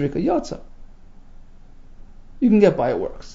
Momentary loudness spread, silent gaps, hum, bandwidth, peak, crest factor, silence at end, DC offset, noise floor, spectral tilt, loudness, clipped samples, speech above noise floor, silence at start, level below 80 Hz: 16 LU; none; 60 Hz at -55 dBFS; 7.8 kHz; -2 dBFS; 20 dB; 0 s; under 0.1%; -41 dBFS; -7.5 dB/octave; -19 LUFS; under 0.1%; 22 dB; 0 s; -40 dBFS